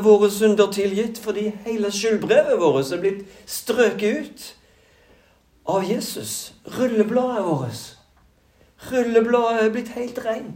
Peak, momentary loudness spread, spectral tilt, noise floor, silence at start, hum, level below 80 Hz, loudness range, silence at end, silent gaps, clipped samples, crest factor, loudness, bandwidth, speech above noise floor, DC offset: -2 dBFS; 14 LU; -4.5 dB/octave; -57 dBFS; 0 s; none; -60 dBFS; 5 LU; 0 s; none; under 0.1%; 18 dB; -21 LUFS; 16 kHz; 37 dB; under 0.1%